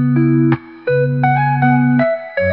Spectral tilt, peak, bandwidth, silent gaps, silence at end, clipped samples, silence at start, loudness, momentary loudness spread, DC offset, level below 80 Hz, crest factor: -12 dB/octave; -2 dBFS; 4.4 kHz; none; 0 s; under 0.1%; 0 s; -15 LUFS; 5 LU; 0.3%; -52 dBFS; 12 dB